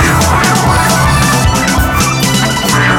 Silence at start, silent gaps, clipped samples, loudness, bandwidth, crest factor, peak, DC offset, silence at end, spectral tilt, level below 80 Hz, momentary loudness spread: 0 s; none; under 0.1%; -9 LUFS; 17.5 kHz; 10 dB; 0 dBFS; under 0.1%; 0 s; -4 dB/octave; -20 dBFS; 2 LU